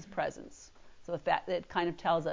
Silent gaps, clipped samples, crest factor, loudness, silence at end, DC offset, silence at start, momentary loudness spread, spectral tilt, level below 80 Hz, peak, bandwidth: none; under 0.1%; 20 dB; -34 LUFS; 0 s; under 0.1%; 0 s; 20 LU; -5 dB/octave; -62 dBFS; -14 dBFS; 7.6 kHz